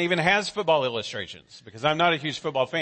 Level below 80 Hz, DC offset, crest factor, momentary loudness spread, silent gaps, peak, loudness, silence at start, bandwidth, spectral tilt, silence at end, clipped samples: -64 dBFS; under 0.1%; 18 dB; 13 LU; none; -8 dBFS; -24 LUFS; 0 s; 8.8 kHz; -4.5 dB/octave; 0 s; under 0.1%